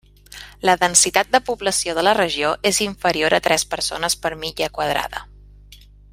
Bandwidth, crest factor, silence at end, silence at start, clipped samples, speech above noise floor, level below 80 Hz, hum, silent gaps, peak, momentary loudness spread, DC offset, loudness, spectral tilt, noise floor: 16 kHz; 20 dB; 0.35 s; 0.35 s; under 0.1%; 26 dB; -46 dBFS; 50 Hz at -45 dBFS; none; 0 dBFS; 10 LU; under 0.1%; -18 LUFS; -1.5 dB/octave; -45 dBFS